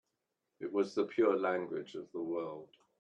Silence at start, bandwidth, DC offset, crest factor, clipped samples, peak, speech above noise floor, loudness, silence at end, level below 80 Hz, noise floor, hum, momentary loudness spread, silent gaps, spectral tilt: 0.6 s; 8.6 kHz; under 0.1%; 20 dB; under 0.1%; -16 dBFS; 51 dB; -35 LUFS; 0.35 s; -84 dBFS; -86 dBFS; none; 14 LU; none; -6.5 dB/octave